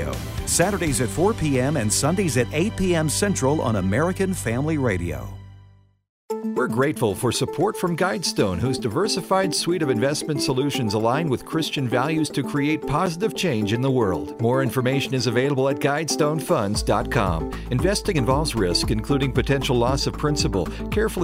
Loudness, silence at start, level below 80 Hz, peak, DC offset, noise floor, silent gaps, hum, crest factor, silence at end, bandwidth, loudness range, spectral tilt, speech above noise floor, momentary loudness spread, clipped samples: -22 LUFS; 0 s; -38 dBFS; -6 dBFS; under 0.1%; -52 dBFS; 6.09-6.28 s; none; 16 dB; 0 s; 16 kHz; 3 LU; -5 dB/octave; 30 dB; 4 LU; under 0.1%